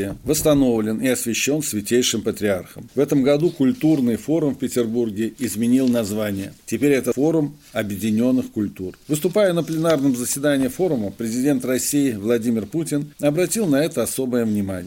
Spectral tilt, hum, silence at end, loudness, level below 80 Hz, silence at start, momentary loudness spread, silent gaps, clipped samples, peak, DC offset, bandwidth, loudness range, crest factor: -5 dB/octave; none; 0 s; -20 LUFS; -52 dBFS; 0 s; 7 LU; none; under 0.1%; -6 dBFS; under 0.1%; 17 kHz; 1 LU; 14 dB